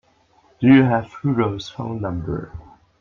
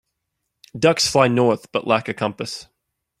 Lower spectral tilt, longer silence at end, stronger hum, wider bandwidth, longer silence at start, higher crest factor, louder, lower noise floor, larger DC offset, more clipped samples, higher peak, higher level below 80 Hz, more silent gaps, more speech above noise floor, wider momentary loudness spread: first, -8 dB/octave vs -4.5 dB/octave; second, 0.4 s vs 0.55 s; neither; second, 7 kHz vs 15.5 kHz; second, 0.6 s vs 0.75 s; about the same, 18 dB vs 20 dB; about the same, -20 LUFS vs -19 LUFS; second, -57 dBFS vs -78 dBFS; neither; neither; about the same, -2 dBFS vs -2 dBFS; first, -48 dBFS vs -58 dBFS; neither; second, 39 dB vs 58 dB; about the same, 15 LU vs 14 LU